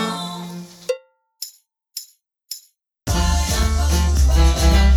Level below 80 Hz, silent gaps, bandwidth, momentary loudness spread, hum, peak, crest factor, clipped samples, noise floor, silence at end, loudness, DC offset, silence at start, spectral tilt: -20 dBFS; none; 18.5 kHz; 18 LU; none; -4 dBFS; 16 dB; under 0.1%; -52 dBFS; 0 s; -19 LUFS; under 0.1%; 0 s; -4.5 dB/octave